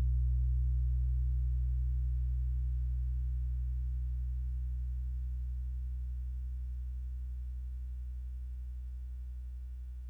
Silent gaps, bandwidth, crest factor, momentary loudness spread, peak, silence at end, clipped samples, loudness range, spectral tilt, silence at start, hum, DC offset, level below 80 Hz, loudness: none; 0.6 kHz; 10 dB; 11 LU; -24 dBFS; 0 s; under 0.1%; 8 LU; -9.5 dB/octave; 0 s; 50 Hz at -60 dBFS; under 0.1%; -34 dBFS; -38 LUFS